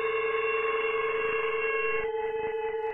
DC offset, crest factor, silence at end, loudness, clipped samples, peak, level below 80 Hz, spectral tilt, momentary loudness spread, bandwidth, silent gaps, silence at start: under 0.1%; 12 dB; 0 s; -29 LUFS; under 0.1%; -16 dBFS; -58 dBFS; -5 dB/octave; 4 LU; 3.9 kHz; none; 0 s